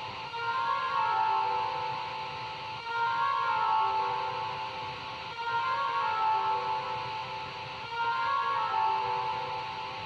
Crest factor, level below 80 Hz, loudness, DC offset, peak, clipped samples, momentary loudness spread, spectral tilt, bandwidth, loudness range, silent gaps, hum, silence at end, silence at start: 14 dB; -66 dBFS; -31 LUFS; under 0.1%; -18 dBFS; under 0.1%; 9 LU; -3.5 dB/octave; 8 kHz; 2 LU; none; none; 0 s; 0 s